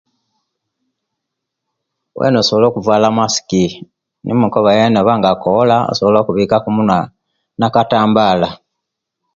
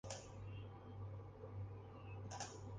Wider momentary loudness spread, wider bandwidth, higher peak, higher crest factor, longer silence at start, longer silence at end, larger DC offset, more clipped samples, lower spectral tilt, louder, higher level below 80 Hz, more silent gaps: first, 8 LU vs 4 LU; second, 7.6 kHz vs 9.6 kHz; first, 0 dBFS vs -32 dBFS; second, 14 dB vs 20 dB; first, 2.15 s vs 0.05 s; first, 0.8 s vs 0 s; neither; neither; about the same, -5.5 dB/octave vs -4.5 dB/octave; first, -13 LUFS vs -53 LUFS; first, -48 dBFS vs -64 dBFS; neither